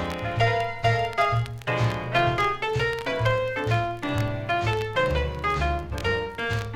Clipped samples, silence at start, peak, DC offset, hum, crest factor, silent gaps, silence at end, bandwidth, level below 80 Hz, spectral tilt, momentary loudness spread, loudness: under 0.1%; 0 s; -10 dBFS; under 0.1%; none; 16 dB; none; 0 s; 14.5 kHz; -38 dBFS; -6 dB/octave; 4 LU; -25 LUFS